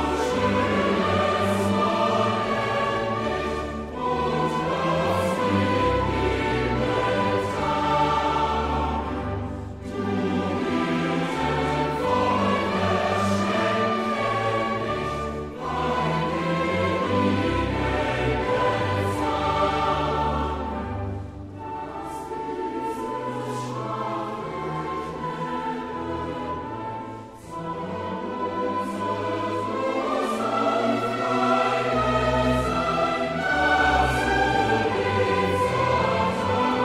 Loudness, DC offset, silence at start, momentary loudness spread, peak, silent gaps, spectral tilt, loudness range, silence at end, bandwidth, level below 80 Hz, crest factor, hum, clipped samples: -24 LUFS; under 0.1%; 0 s; 9 LU; -8 dBFS; none; -6 dB/octave; 8 LU; 0 s; 15 kHz; -40 dBFS; 16 dB; none; under 0.1%